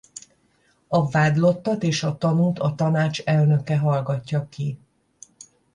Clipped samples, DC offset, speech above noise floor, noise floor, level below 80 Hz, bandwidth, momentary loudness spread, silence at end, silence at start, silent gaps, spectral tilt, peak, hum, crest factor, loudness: under 0.1%; under 0.1%; 42 dB; -63 dBFS; -58 dBFS; 10 kHz; 11 LU; 1 s; 0.15 s; none; -6.5 dB/octave; -6 dBFS; none; 16 dB; -22 LUFS